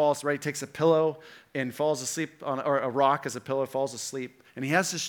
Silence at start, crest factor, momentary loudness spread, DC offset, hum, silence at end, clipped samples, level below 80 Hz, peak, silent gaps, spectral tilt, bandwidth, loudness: 0 s; 20 dB; 11 LU; under 0.1%; none; 0 s; under 0.1%; -78 dBFS; -8 dBFS; none; -4 dB/octave; 19 kHz; -28 LUFS